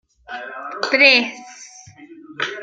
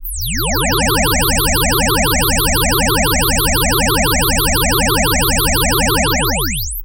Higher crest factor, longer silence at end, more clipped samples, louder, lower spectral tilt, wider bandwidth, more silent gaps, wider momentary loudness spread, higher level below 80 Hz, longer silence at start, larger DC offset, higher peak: first, 20 dB vs 12 dB; about the same, 0 s vs 0 s; neither; about the same, -15 LUFS vs -13 LUFS; second, -1.5 dB/octave vs -3 dB/octave; second, 9 kHz vs 16.5 kHz; neither; first, 27 LU vs 2 LU; second, -68 dBFS vs -22 dBFS; first, 0.3 s vs 0 s; second, under 0.1% vs 0.7%; about the same, 0 dBFS vs -2 dBFS